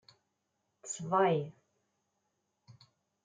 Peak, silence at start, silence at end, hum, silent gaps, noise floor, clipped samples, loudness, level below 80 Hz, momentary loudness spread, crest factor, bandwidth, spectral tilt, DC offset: -16 dBFS; 0.85 s; 0.5 s; none; none; -82 dBFS; under 0.1%; -32 LUFS; -86 dBFS; 18 LU; 22 dB; 9.6 kHz; -5 dB/octave; under 0.1%